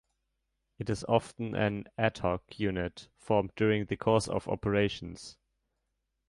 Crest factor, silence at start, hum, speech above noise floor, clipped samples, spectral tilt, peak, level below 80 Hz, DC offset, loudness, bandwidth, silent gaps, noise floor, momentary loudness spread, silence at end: 22 dB; 0.8 s; none; 51 dB; under 0.1%; -6 dB/octave; -12 dBFS; -54 dBFS; under 0.1%; -31 LUFS; 11.5 kHz; none; -82 dBFS; 12 LU; 1 s